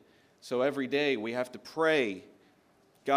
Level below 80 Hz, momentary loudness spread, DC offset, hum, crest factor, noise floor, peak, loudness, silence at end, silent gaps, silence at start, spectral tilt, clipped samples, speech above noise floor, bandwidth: -82 dBFS; 13 LU; under 0.1%; none; 20 dB; -65 dBFS; -12 dBFS; -31 LUFS; 0 s; none; 0.45 s; -5 dB/octave; under 0.1%; 35 dB; 15.5 kHz